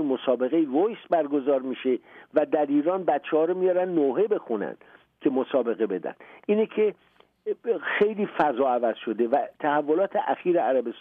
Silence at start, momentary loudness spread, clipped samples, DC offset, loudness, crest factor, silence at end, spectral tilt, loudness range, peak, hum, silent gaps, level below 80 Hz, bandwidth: 0 s; 6 LU; under 0.1%; under 0.1%; -25 LUFS; 14 dB; 0 s; -8.5 dB/octave; 3 LU; -10 dBFS; none; none; -74 dBFS; 4.3 kHz